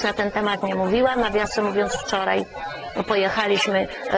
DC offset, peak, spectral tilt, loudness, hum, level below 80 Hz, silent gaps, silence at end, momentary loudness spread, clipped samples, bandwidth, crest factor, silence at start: under 0.1%; -8 dBFS; -4 dB/octave; -22 LUFS; none; -48 dBFS; none; 0 s; 6 LU; under 0.1%; 8 kHz; 16 dB; 0 s